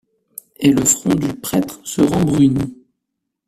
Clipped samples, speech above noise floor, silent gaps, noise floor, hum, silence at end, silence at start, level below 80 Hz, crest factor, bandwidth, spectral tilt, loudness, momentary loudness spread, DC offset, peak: under 0.1%; 61 dB; none; -77 dBFS; none; 0.75 s; 0.6 s; -46 dBFS; 18 dB; 15.5 kHz; -5 dB/octave; -16 LUFS; 17 LU; under 0.1%; 0 dBFS